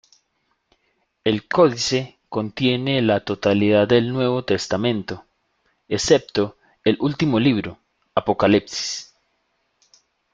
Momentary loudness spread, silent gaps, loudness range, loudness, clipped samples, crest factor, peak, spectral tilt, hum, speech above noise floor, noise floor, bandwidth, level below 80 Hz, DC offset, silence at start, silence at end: 11 LU; none; 3 LU; -20 LUFS; under 0.1%; 20 dB; -2 dBFS; -5 dB/octave; none; 51 dB; -70 dBFS; 9.4 kHz; -54 dBFS; under 0.1%; 1.25 s; 1.3 s